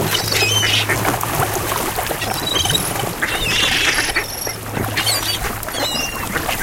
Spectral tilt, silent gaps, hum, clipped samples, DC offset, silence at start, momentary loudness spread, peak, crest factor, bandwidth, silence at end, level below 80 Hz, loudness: -2 dB/octave; none; none; under 0.1%; under 0.1%; 0 s; 7 LU; -2 dBFS; 18 dB; 17.5 kHz; 0 s; -36 dBFS; -17 LUFS